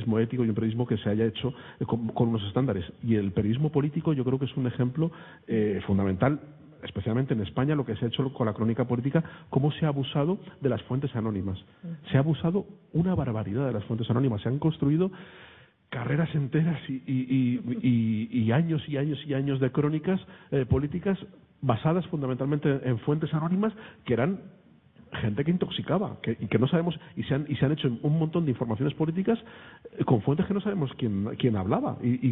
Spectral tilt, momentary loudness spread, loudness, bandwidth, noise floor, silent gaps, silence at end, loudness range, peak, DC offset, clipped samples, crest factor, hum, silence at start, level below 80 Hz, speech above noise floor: -12 dB/octave; 7 LU; -28 LUFS; 4 kHz; -56 dBFS; none; 0 s; 2 LU; -8 dBFS; under 0.1%; under 0.1%; 18 dB; none; 0 s; -54 dBFS; 29 dB